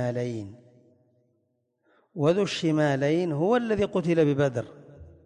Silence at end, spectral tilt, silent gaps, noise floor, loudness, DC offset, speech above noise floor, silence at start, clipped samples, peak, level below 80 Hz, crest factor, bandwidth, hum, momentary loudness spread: 0.15 s; -7 dB/octave; none; -74 dBFS; -25 LUFS; under 0.1%; 49 dB; 0 s; under 0.1%; -12 dBFS; -58 dBFS; 16 dB; 10.5 kHz; none; 14 LU